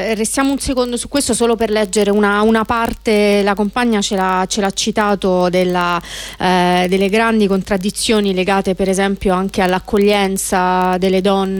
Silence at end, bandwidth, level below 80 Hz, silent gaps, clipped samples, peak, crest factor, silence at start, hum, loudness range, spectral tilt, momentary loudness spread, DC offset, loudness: 0 s; 18.5 kHz; -38 dBFS; none; under 0.1%; -2 dBFS; 12 dB; 0 s; none; 1 LU; -4.5 dB/octave; 4 LU; under 0.1%; -15 LUFS